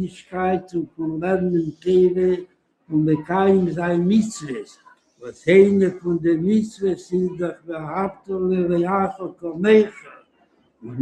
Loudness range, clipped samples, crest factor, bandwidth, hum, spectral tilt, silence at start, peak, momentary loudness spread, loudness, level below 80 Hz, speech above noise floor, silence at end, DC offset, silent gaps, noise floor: 3 LU; under 0.1%; 18 dB; 9.6 kHz; none; -7.5 dB/octave; 0 s; -2 dBFS; 13 LU; -20 LUFS; -56 dBFS; 41 dB; 0 s; under 0.1%; none; -61 dBFS